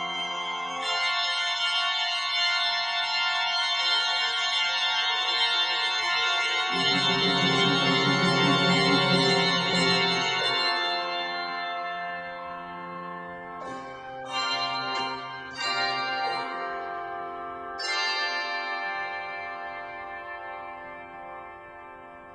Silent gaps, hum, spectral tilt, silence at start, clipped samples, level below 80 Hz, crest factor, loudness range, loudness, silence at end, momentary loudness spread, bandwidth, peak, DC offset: none; none; -3 dB/octave; 0 s; under 0.1%; -66 dBFS; 18 dB; 11 LU; -25 LUFS; 0 s; 16 LU; 11.5 kHz; -10 dBFS; under 0.1%